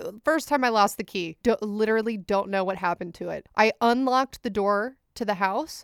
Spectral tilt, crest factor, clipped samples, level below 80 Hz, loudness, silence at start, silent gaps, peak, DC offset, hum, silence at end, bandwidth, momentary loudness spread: -4.5 dB/octave; 20 dB; under 0.1%; -58 dBFS; -25 LUFS; 0 s; none; -6 dBFS; under 0.1%; none; 0 s; 18 kHz; 10 LU